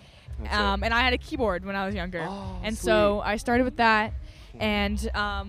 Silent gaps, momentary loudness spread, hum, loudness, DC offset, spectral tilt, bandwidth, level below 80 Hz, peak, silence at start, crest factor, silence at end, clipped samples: none; 11 LU; none; -25 LUFS; under 0.1%; -5 dB/octave; 15 kHz; -36 dBFS; -8 dBFS; 0.15 s; 18 dB; 0 s; under 0.1%